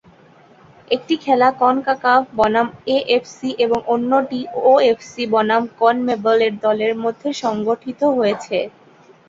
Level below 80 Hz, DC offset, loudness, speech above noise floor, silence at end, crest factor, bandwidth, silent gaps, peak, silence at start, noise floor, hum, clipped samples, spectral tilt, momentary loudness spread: -58 dBFS; under 0.1%; -18 LUFS; 31 dB; 0.6 s; 16 dB; 7.8 kHz; none; -2 dBFS; 0.9 s; -48 dBFS; none; under 0.1%; -5 dB/octave; 8 LU